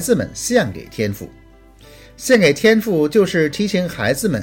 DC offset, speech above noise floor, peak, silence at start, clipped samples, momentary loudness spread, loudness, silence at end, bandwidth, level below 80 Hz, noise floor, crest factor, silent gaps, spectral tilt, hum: under 0.1%; 28 dB; -2 dBFS; 0 s; under 0.1%; 11 LU; -17 LUFS; 0 s; 17 kHz; -46 dBFS; -44 dBFS; 14 dB; none; -4.5 dB/octave; none